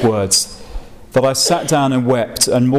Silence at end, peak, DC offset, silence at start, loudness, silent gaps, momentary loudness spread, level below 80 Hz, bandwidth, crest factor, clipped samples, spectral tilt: 0 s; -4 dBFS; 0.6%; 0 s; -15 LUFS; none; 10 LU; -38 dBFS; 16 kHz; 12 dB; under 0.1%; -4 dB/octave